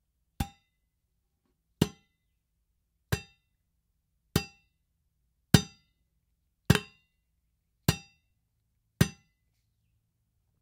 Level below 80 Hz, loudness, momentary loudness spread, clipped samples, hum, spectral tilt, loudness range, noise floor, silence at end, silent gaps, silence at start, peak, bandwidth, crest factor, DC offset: -52 dBFS; -31 LUFS; 17 LU; under 0.1%; none; -5 dB/octave; 8 LU; -78 dBFS; 1.5 s; none; 0.4 s; 0 dBFS; 16 kHz; 34 dB; under 0.1%